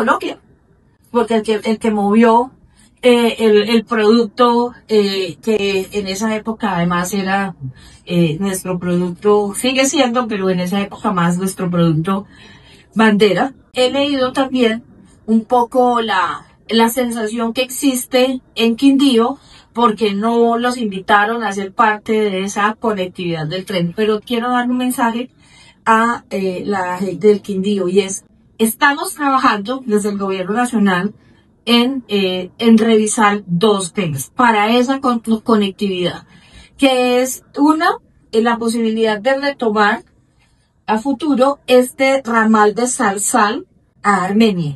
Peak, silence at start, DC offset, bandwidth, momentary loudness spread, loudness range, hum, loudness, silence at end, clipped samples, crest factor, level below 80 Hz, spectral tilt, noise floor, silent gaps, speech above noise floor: 0 dBFS; 0 s; under 0.1%; 12.5 kHz; 8 LU; 3 LU; none; -15 LUFS; 0 s; under 0.1%; 16 dB; -52 dBFS; -4.5 dB/octave; -56 dBFS; none; 41 dB